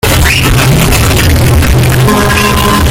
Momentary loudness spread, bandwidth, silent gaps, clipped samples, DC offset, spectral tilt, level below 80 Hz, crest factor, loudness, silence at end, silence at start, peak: 1 LU; 17.5 kHz; none; 0.1%; under 0.1%; -4.5 dB/octave; -14 dBFS; 6 dB; -7 LUFS; 0 s; 0.05 s; 0 dBFS